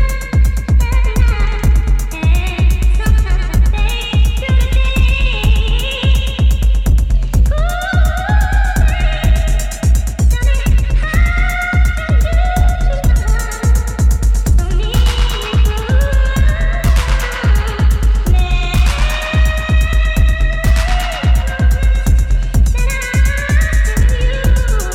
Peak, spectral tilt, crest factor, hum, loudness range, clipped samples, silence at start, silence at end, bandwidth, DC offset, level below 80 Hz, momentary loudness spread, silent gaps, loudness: -2 dBFS; -5 dB/octave; 10 dB; none; 0 LU; under 0.1%; 0 s; 0 s; 15 kHz; under 0.1%; -12 dBFS; 2 LU; none; -15 LUFS